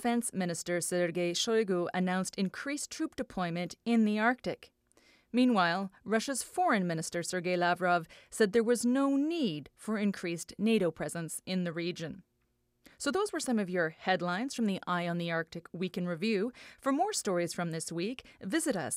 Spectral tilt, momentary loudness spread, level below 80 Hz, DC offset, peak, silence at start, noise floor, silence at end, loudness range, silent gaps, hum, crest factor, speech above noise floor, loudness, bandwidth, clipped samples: -4.5 dB/octave; 9 LU; -70 dBFS; under 0.1%; -14 dBFS; 0 s; -76 dBFS; 0 s; 4 LU; none; none; 18 dB; 45 dB; -32 LUFS; 15.5 kHz; under 0.1%